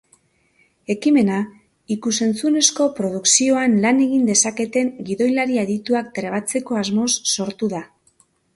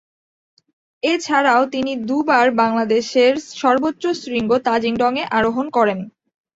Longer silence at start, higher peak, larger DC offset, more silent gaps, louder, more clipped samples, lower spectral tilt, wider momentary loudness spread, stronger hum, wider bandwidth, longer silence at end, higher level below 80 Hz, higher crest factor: second, 0.9 s vs 1.05 s; about the same, 0 dBFS vs -2 dBFS; neither; neither; about the same, -19 LUFS vs -18 LUFS; neither; second, -3 dB/octave vs -4.5 dB/octave; first, 10 LU vs 7 LU; neither; first, 11.5 kHz vs 7.8 kHz; first, 0.7 s vs 0.45 s; second, -62 dBFS vs -56 dBFS; about the same, 20 dB vs 16 dB